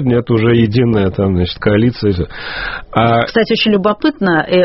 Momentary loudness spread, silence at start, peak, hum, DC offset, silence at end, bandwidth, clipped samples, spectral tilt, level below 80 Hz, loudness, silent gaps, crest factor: 8 LU; 0 s; 0 dBFS; none; under 0.1%; 0 s; 6 kHz; under 0.1%; -5 dB/octave; -36 dBFS; -13 LUFS; none; 12 dB